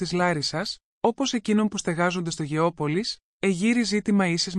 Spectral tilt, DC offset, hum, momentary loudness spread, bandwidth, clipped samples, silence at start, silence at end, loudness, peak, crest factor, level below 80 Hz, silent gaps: -4.5 dB/octave; under 0.1%; none; 6 LU; 11.5 kHz; under 0.1%; 0 s; 0 s; -25 LUFS; -10 dBFS; 14 dB; -58 dBFS; 0.83-1.01 s, 3.23-3.40 s